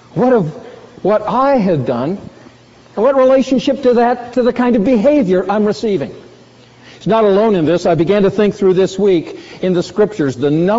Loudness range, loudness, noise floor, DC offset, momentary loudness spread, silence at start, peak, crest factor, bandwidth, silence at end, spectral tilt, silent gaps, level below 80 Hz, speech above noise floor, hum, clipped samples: 2 LU; -13 LUFS; -42 dBFS; under 0.1%; 9 LU; 0.15 s; -2 dBFS; 12 dB; 7.8 kHz; 0 s; -6 dB/octave; none; -46 dBFS; 30 dB; none; under 0.1%